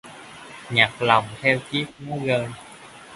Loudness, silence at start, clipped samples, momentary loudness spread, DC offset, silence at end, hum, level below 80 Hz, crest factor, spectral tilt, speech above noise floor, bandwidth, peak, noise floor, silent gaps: -22 LUFS; 0.05 s; under 0.1%; 22 LU; under 0.1%; 0 s; none; -58 dBFS; 24 dB; -5 dB/octave; 19 dB; 11.5 kHz; 0 dBFS; -42 dBFS; none